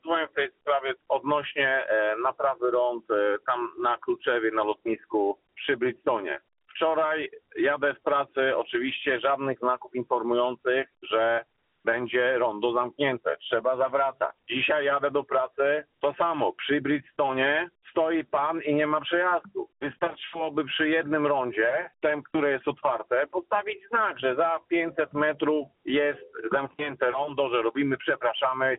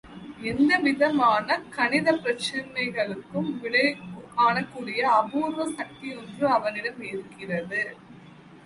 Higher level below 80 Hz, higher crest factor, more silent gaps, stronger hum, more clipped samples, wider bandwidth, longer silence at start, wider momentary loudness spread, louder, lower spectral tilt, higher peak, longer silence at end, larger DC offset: second, -70 dBFS vs -62 dBFS; about the same, 16 dB vs 18 dB; neither; neither; neither; second, 4 kHz vs 11.5 kHz; about the same, 0.05 s vs 0.05 s; second, 5 LU vs 13 LU; about the same, -27 LUFS vs -25 LUFS; second, -2 dB/octave vs -5 dB/octave; about the same, -10 dBFS vs -8 dBFS; about the same, 0 s vs 0.05 s; neither